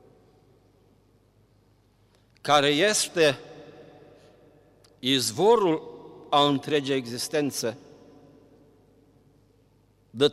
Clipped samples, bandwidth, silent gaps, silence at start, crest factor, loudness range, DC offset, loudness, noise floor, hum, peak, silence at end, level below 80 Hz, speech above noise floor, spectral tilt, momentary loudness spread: under 0.1%; 15.5 kHz; none; 2.45 s; 20 dB; 7 LU; under 0.1%; -24 LUFS; -62 dBFS; none; -8 dBFS; 0 s; -68 dBFS; 39 dB; -3.5 dB/octave; 24 LU